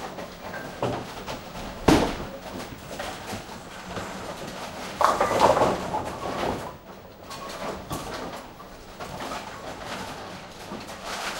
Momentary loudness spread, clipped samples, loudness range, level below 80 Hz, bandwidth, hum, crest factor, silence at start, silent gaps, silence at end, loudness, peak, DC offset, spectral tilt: 18 LU; under 0.1%; 10 LU; -46 dBFS; 16 kHz; none; 28 dB; 0 s; none; 0 s; -29 LUFS; 0 dBFS; under 0.1%; -4.5 dB/octave